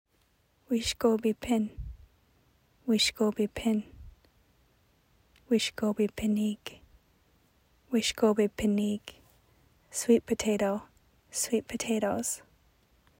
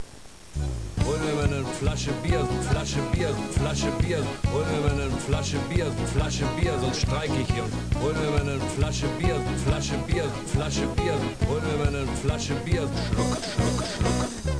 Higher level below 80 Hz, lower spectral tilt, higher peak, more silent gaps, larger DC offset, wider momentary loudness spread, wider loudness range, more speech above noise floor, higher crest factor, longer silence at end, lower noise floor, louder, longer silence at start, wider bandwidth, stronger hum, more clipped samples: second, -56 dBFS vs -34 dBFS; second, -4 dB/octave vs -5.5 dB/octave; about the same, -12 dBFS vs -12 dBFS; neither; second, under 0.1% vs 0.4%; first, 12 LU vs 2 LU; about the same, 3 LU vs 1 LU; first, 41 dB vs 21 dB; first, 20 dB vs 14 dB; first, 0.8 s vs 0 s; first, -70 dBFS vs -46 dBFS; second, -29 LUFS vs -26 LUFS; first, 0.7 s vs 0 s; first, 16 kHz vs 11 kHz; neither; neither